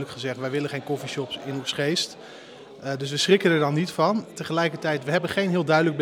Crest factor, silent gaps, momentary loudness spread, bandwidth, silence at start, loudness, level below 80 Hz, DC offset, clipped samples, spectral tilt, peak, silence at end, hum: 20 dB; none; 11 LU; 17 kHz; 0 s; -24 LUFS; -72 dBFS; under 0.1%; under 0.1%; -5 dB/octave; -4 dBFS; 0 s; none